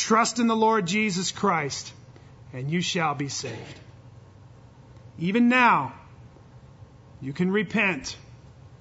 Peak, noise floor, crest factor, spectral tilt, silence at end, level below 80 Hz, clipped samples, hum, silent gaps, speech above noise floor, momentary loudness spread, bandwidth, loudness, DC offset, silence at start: -6 dBFS; -49 dBFS; 22 dB; -4.5 dB/octave; 0.05 s; -60 dBFS; under 0.1%; none; none; 25 dB; 19 LU; 8 kHz; -24 LUFS; under 0.1%; 0 s